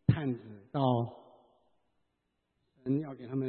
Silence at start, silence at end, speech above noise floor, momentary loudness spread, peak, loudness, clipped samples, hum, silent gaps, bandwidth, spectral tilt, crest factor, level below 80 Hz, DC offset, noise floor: 0.1 s; 0 s; 48 dB; 11 LU; -12 dBFS; -34 LUFS; under 0.1%; none; none; 4.4 kHz; -11.5 dB/octave; 22 dB; -62 dBFS; under 0.1%; -81 dBFS